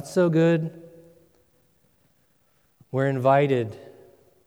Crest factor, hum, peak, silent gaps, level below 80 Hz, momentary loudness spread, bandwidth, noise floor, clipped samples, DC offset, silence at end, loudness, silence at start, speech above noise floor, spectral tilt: 20 dB; none; -6 dBFS; none; -72 dBFS; 15 LU; 13 kHz; -66 dBFS; under 0.1%; under 0.1%; 0.6 s; -23 LUFS; 0 s; 45 dB; -7.5 dB/octave